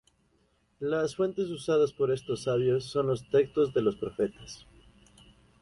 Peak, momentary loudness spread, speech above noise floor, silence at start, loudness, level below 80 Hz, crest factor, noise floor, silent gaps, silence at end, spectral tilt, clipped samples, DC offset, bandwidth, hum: -14 dBFS; 7 LU; 41 dB; 0.8 s; -29 LUFS; -62 dBFS; 16 dB; -70 dBFS; none; 1.05 s; -6.5 dB/octave; under 0.1%; under 0.1%; 11.5 kHz; none